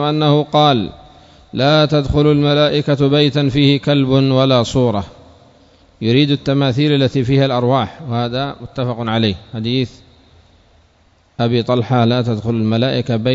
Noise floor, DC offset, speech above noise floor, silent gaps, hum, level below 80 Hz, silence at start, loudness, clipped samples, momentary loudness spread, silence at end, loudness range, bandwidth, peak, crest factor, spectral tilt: -54 dBFS; under 0.1%; 39 dB; none; none; -42 dBFS; 0 s; -15 LUFS; under 0.1%; 9 LU; 0 s; 7 LU; 7.8 kHz; 0 dBFS; 16 dB; -7 dB/octave